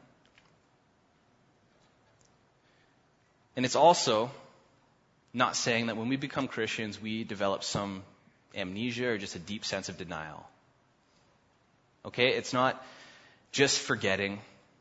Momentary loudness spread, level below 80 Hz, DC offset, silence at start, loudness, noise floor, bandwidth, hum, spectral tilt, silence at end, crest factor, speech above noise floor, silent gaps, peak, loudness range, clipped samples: 17 LU; -70 dBFS; under 0.1%; 3.55 s; -30 LUFS; -68 dBFS; 8 kHz; none; -3.5 dB/octave; 0.35 s; 24 dB; 37 dB; none; -8 dBFS; 8 LU; under 0.1%